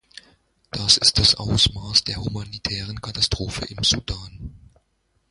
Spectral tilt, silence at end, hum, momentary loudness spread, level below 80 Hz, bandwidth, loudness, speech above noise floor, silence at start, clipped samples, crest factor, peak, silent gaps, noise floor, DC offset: -2.5 dB/octave; 0.75 s; none; 18 LU; -38 dBFS; 11.5 kHz; -19 LUFS; 46 dB; 0.75 s; under 0.1%; 22 dB; 0 dBFS; none; -68 dBFS; under 0.1%